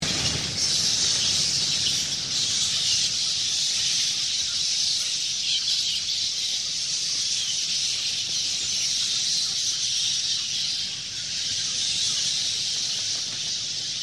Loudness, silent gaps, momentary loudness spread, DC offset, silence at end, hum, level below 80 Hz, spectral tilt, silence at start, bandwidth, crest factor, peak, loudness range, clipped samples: -22 LUFS; none; 4 LU; under 0.1%; 0 s; none; -58 dBFS; 0.5 dB/octave; 0 s; 16 kHz; 16 dB; -10 dBFS; 2 LU; under 0.1%